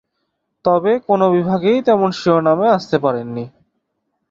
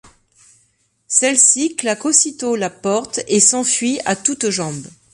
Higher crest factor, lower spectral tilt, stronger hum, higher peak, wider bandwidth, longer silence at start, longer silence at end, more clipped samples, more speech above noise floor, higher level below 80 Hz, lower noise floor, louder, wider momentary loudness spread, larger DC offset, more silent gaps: about the same, 16 dB vs 18 dB; first, -7.5 dB/octave vs -2 dB/octave; neither; about the same, -2 dBFS vs 0 dBFS; second, 7.6 kHz vs 11.5 kHz; second, 0.65 s vs 1.1 s; first, 0.8 s vs 0.25 s; neither; first, 57 dB vs 44 dB; about the same, -58 dBFS vs -62 dBFS; first, -72 dBFS vs -61 dBFS; about the same, -16 LUFS vs -15 LUFS; about the same, 9 LU vs 10 LU; neither; neither